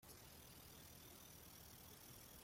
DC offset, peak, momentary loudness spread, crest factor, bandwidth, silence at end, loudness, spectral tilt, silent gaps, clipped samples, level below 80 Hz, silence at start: under 0.1%; -46 dBFS; 1 LU; 14 dB; 16.5 kHz; 0 s; -60 LUFS; -3 dB/octave; none; under 0.1%; -74 dBFS; 0 s